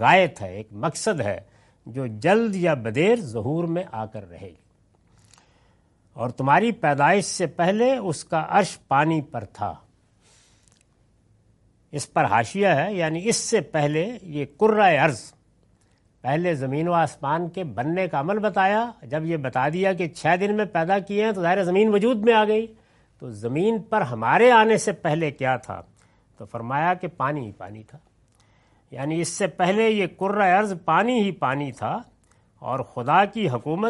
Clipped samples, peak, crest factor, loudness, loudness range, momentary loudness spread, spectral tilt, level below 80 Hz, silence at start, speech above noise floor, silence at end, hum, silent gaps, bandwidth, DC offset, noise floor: under 0.1%; -2 dBFS; 22 dB; -22 LUFS; 7 LU; 14 LU; -5 dB/octave; -62 dBFS; 0 s; 39 dB; 0 s; none; none; 11.5 kHz; under 0.1%; -61 dBFS